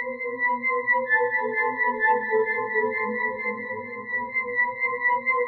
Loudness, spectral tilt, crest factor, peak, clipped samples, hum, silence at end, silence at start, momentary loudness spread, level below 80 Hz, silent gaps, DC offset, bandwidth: -24 LUFS; -2.5 dB/octave; 14 dB; -10 dBFS; under 0.1%; none; 0 s; 0 s; 8 LU; -70 dBFS; none; under 0.1%; 4.4 kHz